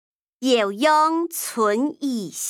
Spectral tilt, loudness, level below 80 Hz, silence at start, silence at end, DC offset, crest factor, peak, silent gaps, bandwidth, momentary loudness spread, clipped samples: -3 dB/octave; -21 LUFS; -80 dBFS; 0.4 s; 0 s; under 0.1%; 16 dB; -4 dBFS; none; 19 kHz; 9 LU; under 0.1%